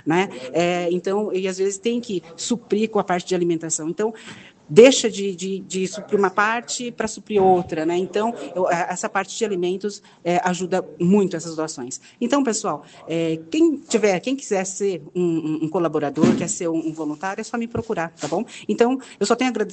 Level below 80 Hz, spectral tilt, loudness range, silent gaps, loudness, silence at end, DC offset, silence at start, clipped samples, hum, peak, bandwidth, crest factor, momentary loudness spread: -62 dBFS; -4.5 dB/octave; 4 LU; none; -22 LUFS; 0 s; under 0.1%; 0.05 s; under 0.1%; none; 0 dBFS; 9.2 kHz; 22 dB; 9 LU